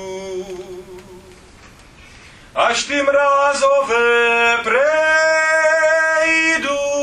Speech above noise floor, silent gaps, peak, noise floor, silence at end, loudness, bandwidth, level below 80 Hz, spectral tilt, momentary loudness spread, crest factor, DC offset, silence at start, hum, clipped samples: 28 dB; none; -2 dBFS; -43 dBFS; 0 s; -14 LUFS; 11.5 kHz; -52 dBFS; -1.5 dB/octave; 14 LU; 16 dB; under 0.1%; 0 s; none; under 0.1%